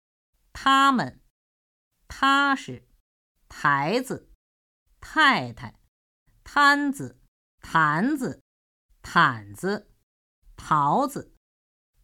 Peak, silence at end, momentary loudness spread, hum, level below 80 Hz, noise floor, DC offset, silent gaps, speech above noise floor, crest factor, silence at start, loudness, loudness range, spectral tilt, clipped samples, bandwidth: -4 dBFS; 0.8 s; 18 LU; none; -58 dBFS; under -90 dBFS; under 0.1%; 1.30-1.91 s, 3.00-3.35 s, 4.35-4.86 s, 5.88-6.26 s, 7.28-7.58 s, 8.41-8.89 s, 10.03-10.42 s; over 67 dB; 22 dB; 0.55 s; -23 LUFS; 3 LU; -4.5 dB/octave; under 0.1%; 16.5 kHz